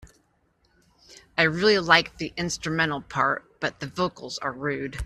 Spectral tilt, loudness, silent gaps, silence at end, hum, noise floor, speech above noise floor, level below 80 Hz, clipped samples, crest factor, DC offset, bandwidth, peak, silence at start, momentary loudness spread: -4 dB/octave; -24 LUFS; none; 0 s; none; -67 dBFS; 42 dB; -52 dBFS; under 0.1%; 26 dB; under 0.1%; 13.5 kHz; -2 dBFS; 0 s; 12 LU